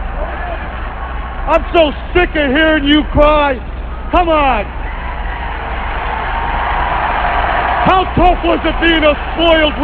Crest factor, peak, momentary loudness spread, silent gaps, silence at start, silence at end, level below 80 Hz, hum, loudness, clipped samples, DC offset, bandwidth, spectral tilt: 14 dB; 0 dBFS; 13 LU; none; 0 s; 0 s; -22 dBFS; none; -14 LUFS; under 0.1%; 0.6%; 5.2 kHz; -7.5 dB/octave